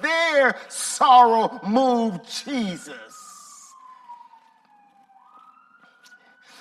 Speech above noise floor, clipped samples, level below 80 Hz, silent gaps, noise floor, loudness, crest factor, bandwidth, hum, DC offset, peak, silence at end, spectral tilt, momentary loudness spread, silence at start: 37 dB; under 0.1%; -72 dBFS; none; -57 dBFS; -19 LUFS; 20 dB; 14.5 kHz; none; under 0.1%; -4 dBFS; 2.45 s; -3 dB/octave; 27 LU; 0 s